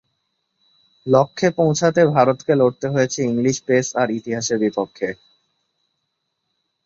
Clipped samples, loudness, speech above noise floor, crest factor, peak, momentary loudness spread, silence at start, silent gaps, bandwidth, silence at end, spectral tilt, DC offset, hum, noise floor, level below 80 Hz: under 0.1%; -19 LUFS; 57 dB; 20 dB; -2 dBFS; 10 LU; 1.05 s; none; 7.8 kHz; 1.7 s; -5.5 dB/octave; under 0.1%; none; -75 dBFS; -60 dBFS